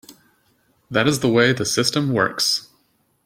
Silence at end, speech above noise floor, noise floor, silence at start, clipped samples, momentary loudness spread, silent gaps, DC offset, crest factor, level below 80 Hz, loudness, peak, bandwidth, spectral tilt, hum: 0.65 s; 45 dB; -64 dBFS; 0.1 s; under 0.1%; 4 LU; none; under 0.1%; 20 dB; -58 dBFS; -19 LUFS; -2 dBFS; 16.5 kHz; -4 dB/octave; none